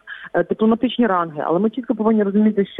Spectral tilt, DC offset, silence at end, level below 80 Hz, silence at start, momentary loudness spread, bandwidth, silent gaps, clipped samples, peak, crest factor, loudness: -9.5 dB/octave; under 0.1%; 0 s; -58 dBFS; 0.05 s; 5 LU; 3.9 kHz; none; under 0.1%; -6 dBFS; 12 dB; -19 LUFS